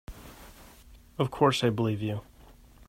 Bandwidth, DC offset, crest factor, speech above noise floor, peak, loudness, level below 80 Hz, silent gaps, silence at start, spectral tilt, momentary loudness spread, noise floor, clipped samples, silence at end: 16 kHz; under 0.1%; 22 dB; 27 dB; -8 dBFS; -28 LUFS; -54 dBFS; none; 0.1 s; -6 dB/octave; 25 LU; -54 dBFS; under 0.1%; 0.65 s